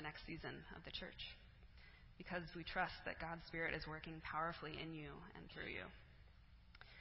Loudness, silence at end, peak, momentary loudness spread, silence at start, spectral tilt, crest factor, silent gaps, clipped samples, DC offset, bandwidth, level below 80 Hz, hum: -49 LUFS; 0 s; -28 dBFS; 20 LU; 0 s; -2.5 dB/octave; 24 dB; none; under 0.1%; under 0.1%; 5.6 kHz; -64 dBFS; none